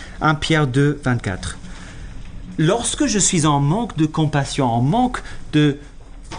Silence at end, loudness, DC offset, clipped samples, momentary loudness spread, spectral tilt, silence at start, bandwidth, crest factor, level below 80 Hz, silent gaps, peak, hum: 0 s; -18 LUFS; under 0.1%; under 0.1%; 19 LU; -5 dB/octave; 0 s; 10 kHz; 14 dB; -36 dBFS; none; -4 dBFS; none